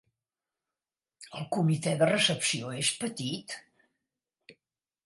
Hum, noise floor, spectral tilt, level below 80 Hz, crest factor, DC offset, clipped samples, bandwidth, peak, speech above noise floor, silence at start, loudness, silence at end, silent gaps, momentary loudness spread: none; under -90 dBFS; -4 dB/octave; -74 dBFS; 22 dB; under 0.1%; under 0.1%; 11.5 kHz; -12 dBFS; over 61 dB; 1.2 s; -28 LUFS; 0.55 s; none; 17 LU